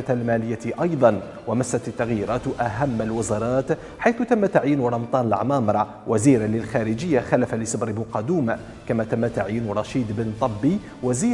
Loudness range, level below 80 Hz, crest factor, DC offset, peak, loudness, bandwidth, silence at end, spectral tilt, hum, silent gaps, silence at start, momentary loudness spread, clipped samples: 3 LU; -48 dBFS; 20 dB; under 0.1%; -2 dBFS; -23 LUFS; 11.5 kHz; 0 s; -6.5 dB/octave; none; none; 0 s; 7 LU; under 0.1%